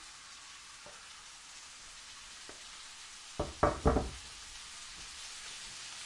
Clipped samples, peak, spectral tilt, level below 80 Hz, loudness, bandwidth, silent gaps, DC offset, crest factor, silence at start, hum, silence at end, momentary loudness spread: under 0.1%; -12 dBFS; -4 dB/octave; -48 dBFS; -40 LUFS; 11.5 kHz; none; under 0.1%; 28 dB; 0 s; none; 0 s; 16 LU